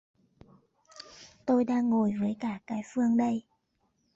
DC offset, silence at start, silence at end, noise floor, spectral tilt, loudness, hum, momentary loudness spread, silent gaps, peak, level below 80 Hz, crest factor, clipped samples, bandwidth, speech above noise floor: under 0.1%; 0.95 s; 0.75 s; -75 dBFS; -7 dB/octave; -29 LUFS; none; 21 LU; none; -16 dBFS; -68 dBFS; 16 dB; under 0.1%; 7.8 kHz; 47 dB